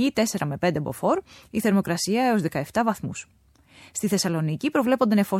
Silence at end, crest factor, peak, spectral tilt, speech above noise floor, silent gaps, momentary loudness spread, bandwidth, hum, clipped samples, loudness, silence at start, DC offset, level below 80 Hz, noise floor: 0 s; 16 dB; -8 dBFS; -5 dB/octave; 29 dB; none; 9 LU; 16.5 kHz; none; under 0.1%; -24 LUFS; 0 s; under 0.1%; -58 dBFS; -52 dBFS